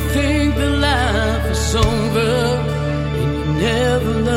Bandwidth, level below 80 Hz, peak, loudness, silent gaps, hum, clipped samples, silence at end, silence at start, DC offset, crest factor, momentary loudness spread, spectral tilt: 16.5 kHz; -24 dBFS; -4 dBFS; -17 LUFS; none; none; under 0.1%; 0 s; 0 s; under 0.1%; 12 dB; 4 LU; -5.5 dB/octave